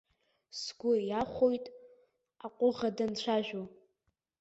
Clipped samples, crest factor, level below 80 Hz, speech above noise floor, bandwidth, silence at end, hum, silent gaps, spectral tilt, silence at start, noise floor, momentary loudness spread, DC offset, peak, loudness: under 0.1%; 18 dB; -68 dBFS; 49 dB; 8 kHz; 0.7 s; none; none; -5 dB/octave; 0.55 s; -81 dBFS; 18 LU; under 0.1%; -16 dBFS; -33 LUFS